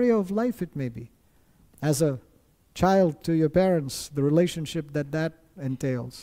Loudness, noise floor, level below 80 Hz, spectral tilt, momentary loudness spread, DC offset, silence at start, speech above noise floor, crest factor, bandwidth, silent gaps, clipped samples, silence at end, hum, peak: -26 LUFS; -60 dBFS; -52 dBFS; -6.5 dB/octave; 12 LU; under 0.1%; 0 s; 35 dB; 16 dB; 16 kHz; none; under 0.1%; 0 s; none; -10 dBFS